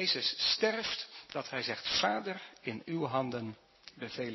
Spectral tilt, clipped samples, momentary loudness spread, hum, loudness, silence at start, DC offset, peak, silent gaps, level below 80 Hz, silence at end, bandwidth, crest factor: -3.5 dB/octave; under 0.1%; 13 LU; none; -34 LUFS; 0 s; under 0.1%; -16 dBFS; none; -70 dBFS; 0 s; 6.2 kHz; 20 dB